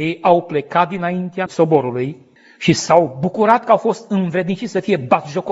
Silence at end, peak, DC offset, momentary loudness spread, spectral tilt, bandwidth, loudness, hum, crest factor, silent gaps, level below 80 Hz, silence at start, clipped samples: 0 s; 0 dBFS; under 0.1%; 8 LU; -6 dB/octave; 8 kHz; -17 LUFS; none; 16 dB; none; -60 dBFS; 0 s; under 0.1%